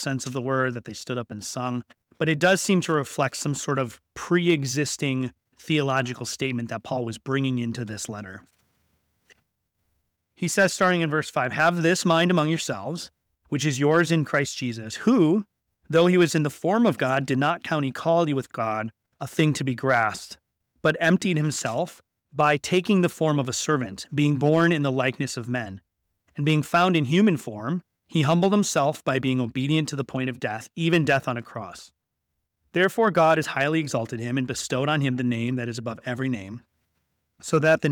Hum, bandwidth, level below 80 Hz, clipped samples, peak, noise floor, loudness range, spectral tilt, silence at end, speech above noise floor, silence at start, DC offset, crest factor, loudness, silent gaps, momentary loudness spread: none; 18.5 kHz; -64 dBFS; under 0.1%; -8 dBFS; -80 dBFS; 5 LU; -5 dB/octave; 0 s; 56 dB; 0 s; under 0.1%; 16 dB; -24 LUFS; none; 12 LU